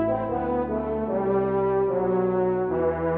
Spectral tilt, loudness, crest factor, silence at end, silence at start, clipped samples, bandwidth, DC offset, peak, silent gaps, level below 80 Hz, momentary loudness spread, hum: -12 dB/octave; -25 LUFS; 12 dB; 0 s; 0 s; under 0.1%; 3.7 kHz; under 0.1%; -12 dBFS; none; -46 dBFS; 3 LU; none